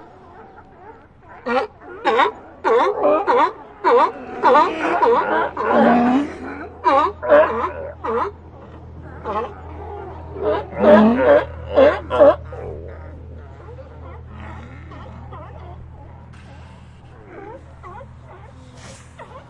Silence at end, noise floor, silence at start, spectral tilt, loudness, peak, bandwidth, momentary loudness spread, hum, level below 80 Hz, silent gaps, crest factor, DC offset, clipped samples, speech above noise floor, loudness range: 0.1 s; -43 dBFS; 0.4 s; -7 dB/octave; -17 LUFS; 0 dBFS; 9 kHz; 24 LU; none; -46 dBFS; none; 18 dB; under 0.1%; under 0.1%; 27 dB; 21 LU